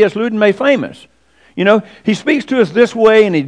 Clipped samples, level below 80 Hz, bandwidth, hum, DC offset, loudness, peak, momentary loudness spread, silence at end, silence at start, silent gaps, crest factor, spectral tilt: 0.3%; -56 dBFS; 10 kHz; none; 0.2%; -13 LUFS; 0 dBFS; 8 LU; 0 s; 0 s; none; 12 dB; -6 dB/octave